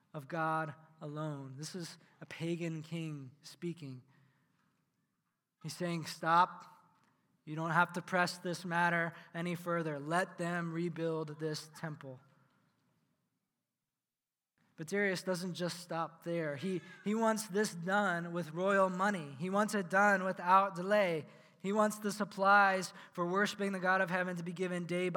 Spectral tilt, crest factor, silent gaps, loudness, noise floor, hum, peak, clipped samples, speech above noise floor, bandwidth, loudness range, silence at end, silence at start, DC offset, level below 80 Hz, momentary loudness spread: -5 dB/octave; 22 dB; none; -35 LUFS; under -90 dBFS; none; -14 dBFS; under 0.1%; over 55 dB; 18 kHz; 13 LU; 0 s; 0.15 s; under 0.1%; under -90 dBFS; 15 LU